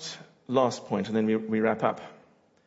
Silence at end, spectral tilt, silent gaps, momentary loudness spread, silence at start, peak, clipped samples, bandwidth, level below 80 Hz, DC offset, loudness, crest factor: 0.5 s; -6 dB/octave; none; 14 LU; 0 s; -10 dBFS; under 0.1%; 8 kHz; -74 dBFS; under 0.1%; -27 LUFS; 18 dB